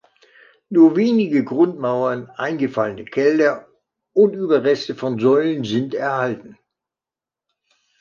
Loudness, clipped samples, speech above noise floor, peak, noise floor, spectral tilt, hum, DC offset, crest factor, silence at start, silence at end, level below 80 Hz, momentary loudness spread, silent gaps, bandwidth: -18 LUFS; under 0.1%; 72 dB; -2 dBFS; -89 dBFS; -7 dB/octave; none; under 0.1%; 16 dB; 0.7 s; 1.5 s; -66 dBFS; 10 LU; none; 7.2 kHz